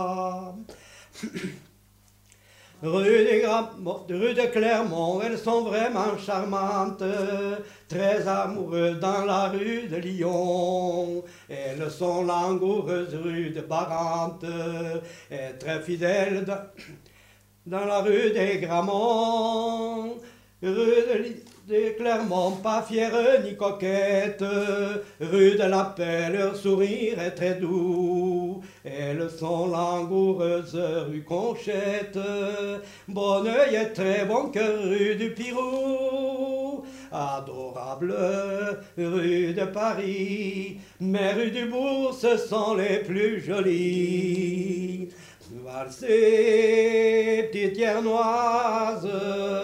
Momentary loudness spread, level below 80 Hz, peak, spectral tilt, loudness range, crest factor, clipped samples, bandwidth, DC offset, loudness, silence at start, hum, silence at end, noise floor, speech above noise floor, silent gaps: 13 LU; -66 dBFS; -8 dBFS; -6 dB/octave; 5 LU; 18 dB; under 0.1%; 15.5 kHz; under 0.1%; -26 LUFS; 0 s; none; 0 s; -58 dBFS; 33 dB; none